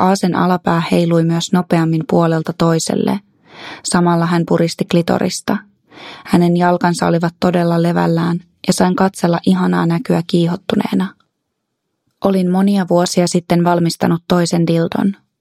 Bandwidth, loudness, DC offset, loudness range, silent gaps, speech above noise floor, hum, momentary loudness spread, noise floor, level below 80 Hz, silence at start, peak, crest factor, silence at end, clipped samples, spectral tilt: 14 kHz; -15 LUFS; under 0.1%; 2 LU; none; 58 dB; none; 6 LU; -73 dBFS; -52 dBFS; 0 s; 0 dBFS; 14 dB; 0.25 s; under 0.1%; -6 dB/octave